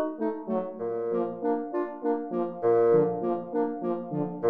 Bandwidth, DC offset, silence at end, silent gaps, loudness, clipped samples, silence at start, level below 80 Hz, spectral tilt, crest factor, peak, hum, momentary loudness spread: 3.5 kHz; 0.1%; 0 s; none; -28 LUFS; under 0.1%; 0 s; -74 dBFS; -11 dB/octave; 16 dB; -12 dBFS; none; 9 LU